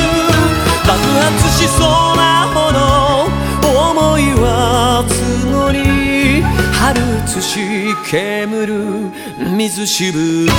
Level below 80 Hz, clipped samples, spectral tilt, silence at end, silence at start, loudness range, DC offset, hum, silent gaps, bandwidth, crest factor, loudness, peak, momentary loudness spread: -24 dBFS; under 0.1%; -4.5 dB/octave; 0 s; 0 s; 5 LU; under 0.1%; none; none; over 20 kHz; 12 dB; -13 LUFS; 0 dBFS; 6 LU